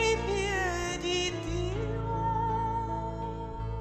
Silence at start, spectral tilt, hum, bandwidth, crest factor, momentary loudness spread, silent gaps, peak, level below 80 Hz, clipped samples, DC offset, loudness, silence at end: 0 s; -4.5 dB/octave; none; 13 kHz; 16 dB; 7 LU; none; -16 dBFS; -40 dBFS; under 0.1%; under 0.1%; -31 LUFS; 0 s